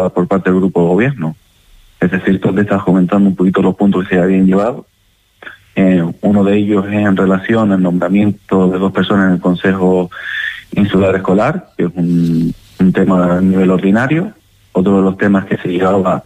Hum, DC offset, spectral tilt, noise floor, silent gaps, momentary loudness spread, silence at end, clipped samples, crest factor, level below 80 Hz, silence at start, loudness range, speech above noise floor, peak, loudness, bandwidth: none; under 0.1%; -8.5 dB/octave; -46 dBFS; none; 7 LU; 0.05 s; under 0.1%; 10 dB; -44 dBFS; 0 s; 1 LU; 34 dB; -2 dBFS; -13 LUFS; 8.6 kHz